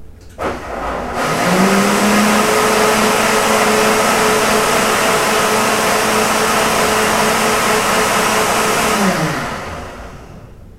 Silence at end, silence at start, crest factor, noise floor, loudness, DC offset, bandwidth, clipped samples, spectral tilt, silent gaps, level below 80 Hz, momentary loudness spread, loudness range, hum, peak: 0 s; 0 s; 14 dB; -35 dBFS; -13 LUFS; under 0.1%; 16 kHz; under 0.1%; -3 dB/octave; none; -38 dBFS; 11 LU; 2 LU; none; 0 dBFS